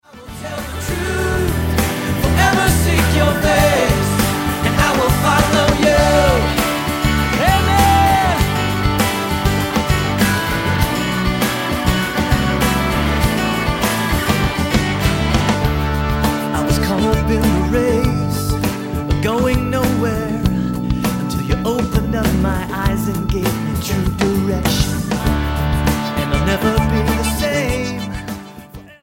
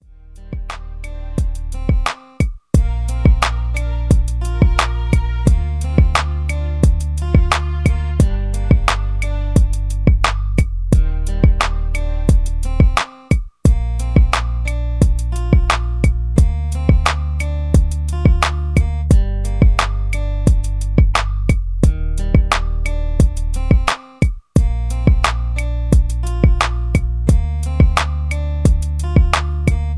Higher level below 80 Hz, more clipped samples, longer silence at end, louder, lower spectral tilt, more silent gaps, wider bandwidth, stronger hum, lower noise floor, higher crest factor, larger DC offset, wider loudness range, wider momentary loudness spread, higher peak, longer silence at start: second, -24 dBFS vs -16 dBFS; neither; about the same, 0.1 s vs 0 s; about the same, -16 LUFS vs -17 LUFS; about the same, -5 dB/octave vs -6 dB/octave; neither; first, 17 kHz vs 11 kHz; neither; about the same, -36 dBFS vs -37 dBFS; about the same, 16 dB vs 14 dB; neither; first, 4 LU vs 1 LU; about the same, 6 LU vs 6 LU; about the same, -2 dBFS vs 0 dBFS; second, 0.15 s vs 0.3 s